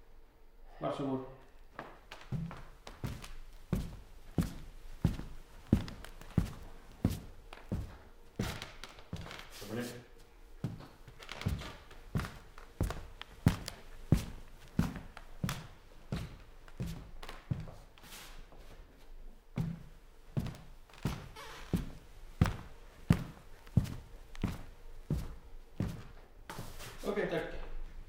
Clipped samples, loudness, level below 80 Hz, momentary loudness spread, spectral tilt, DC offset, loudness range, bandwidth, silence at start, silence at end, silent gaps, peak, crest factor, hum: under 0.1%; -40 LUFS; -48 dBFS; 22 LU; -6.5 dB/octave; under 0.1%; 7 LU; 17 kHz; 0 s; 0 s; none; -12 dBFS; 28 dB; none